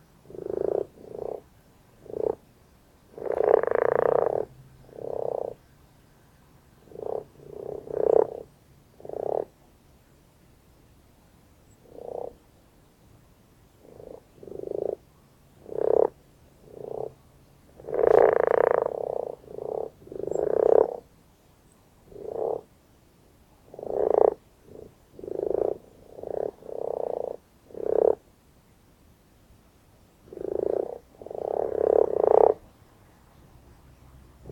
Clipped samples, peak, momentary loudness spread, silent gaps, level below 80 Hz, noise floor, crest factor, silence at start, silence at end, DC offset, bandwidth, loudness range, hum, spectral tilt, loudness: under 0.1%; -2 dBFS; 22 LU; none; -60 dBFS; -58 dBFS; 28 dB; 0.3 s; 0 s; under 0.1%; 8.8 kHz; 14 LU; none; -7.5 dB/octave; -27 LUFS